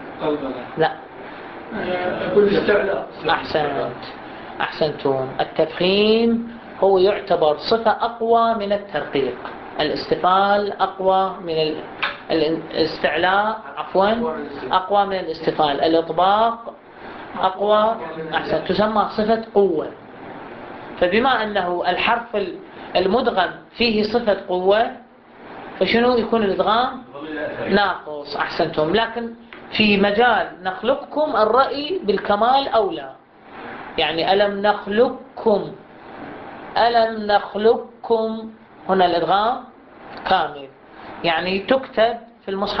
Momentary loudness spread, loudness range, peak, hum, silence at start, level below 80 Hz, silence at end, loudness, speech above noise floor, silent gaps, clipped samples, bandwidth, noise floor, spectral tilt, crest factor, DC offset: 17 LU; 3 LU; -2 dBFS; none; 0 s; -52 dBFS; 0 s; -20 LUFS; 23 dB; none; under 0.1%; 6 kHz; -42 dBFS; -2.5 dB/octave; 18 dB; under 0.1%